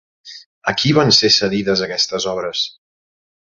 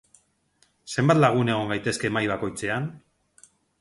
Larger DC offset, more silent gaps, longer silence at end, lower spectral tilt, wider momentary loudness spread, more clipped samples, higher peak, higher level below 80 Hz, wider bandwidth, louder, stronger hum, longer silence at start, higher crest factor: neither; first, 0.46-0.61 s vs none; about the same, 0.7 s vs 0.8 s; second, -3.5 dB/octave vs -5.5 dB/octave; about the same, 11 LU vs 11 LU; neither; first, 0 dBFS vs -4 dBFS; first, -52 dBFS vs -58 dBFS; second, 7.6 kHz vs 11.5 kHz; first, -15 LUFS vs -24 LUFS; neither; second, 0.25 s vs 0.85 s; about the same, 18 dB vs 22 dB